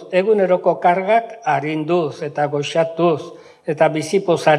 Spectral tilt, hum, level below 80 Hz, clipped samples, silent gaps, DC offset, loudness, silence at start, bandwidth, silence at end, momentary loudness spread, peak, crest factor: -6 dB/octave; none; -74 dBFS; under 0.1%; none; under 0.1%; -18 LUFS; 0 s; 12.5 kHz; 0 s; 8 LU; 0 dBFS; 16 dB